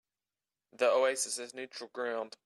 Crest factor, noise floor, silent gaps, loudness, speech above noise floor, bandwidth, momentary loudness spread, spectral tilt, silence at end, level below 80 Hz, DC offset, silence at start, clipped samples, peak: 18 dB; under -90 dBFS; none; -32 LUFS; over 57 dB; 14 kHz; 15 LU; -0.5 dB/octave; 0.15 s; -90 dBFS; under 0.1%; 0.75 s; under 0.1%; -16 dBFS